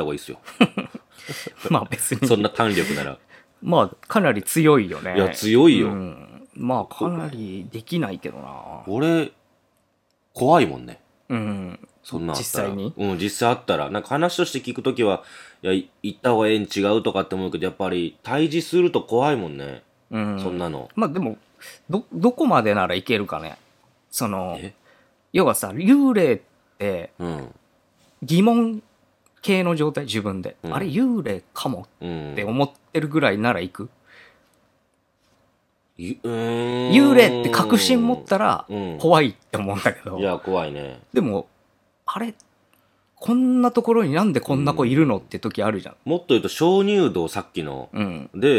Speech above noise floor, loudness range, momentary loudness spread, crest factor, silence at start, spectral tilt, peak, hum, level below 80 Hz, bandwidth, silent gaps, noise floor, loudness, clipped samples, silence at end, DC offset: 47 dB; 7 LU; 16 LU; 22 dB; 0 s; -5.5 dB/octave; 0 dBFS; none; -60 dBFS; 17.5 kHz; none; -67 dBFS; -21 LUFS; under 0.1%; 0 s; under 0.1%